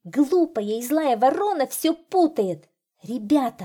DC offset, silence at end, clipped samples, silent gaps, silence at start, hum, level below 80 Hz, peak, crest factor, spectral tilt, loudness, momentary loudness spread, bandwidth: under 0.1%; 0 s; under 0.1%; none; 0.05 s; none; -70 dBFS; -8 dBFS; 14 dB; -5 dB/octave; -22 LUFS; 8 LU; 19 kHz